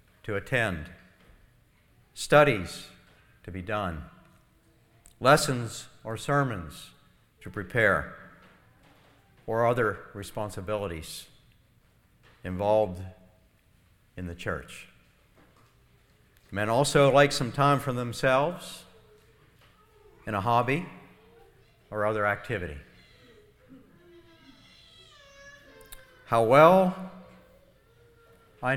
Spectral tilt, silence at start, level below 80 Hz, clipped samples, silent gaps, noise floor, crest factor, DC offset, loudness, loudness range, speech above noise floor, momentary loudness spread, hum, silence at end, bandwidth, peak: -5 dB/octave; 0.25 s; -54 dBFS; under 0.1%; none; -63 dBFS; 24 dB; under 0.1%; -26 LUFS; 9 LU; 37 dB; 25 LU; none; 0 s; 17 kHz; -4 dBFS